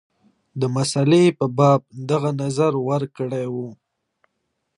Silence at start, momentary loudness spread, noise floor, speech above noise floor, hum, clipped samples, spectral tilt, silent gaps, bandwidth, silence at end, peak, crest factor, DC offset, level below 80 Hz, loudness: 0.55 s; 12 LU; -75 dBFS; 56 dB; none; under 0.1%; -6.5 dB/octave; none; 11 kHz; 1.05 s; -2 dBFS; 18 dB; under 0.1%; -66 dBFS; -20 LUFS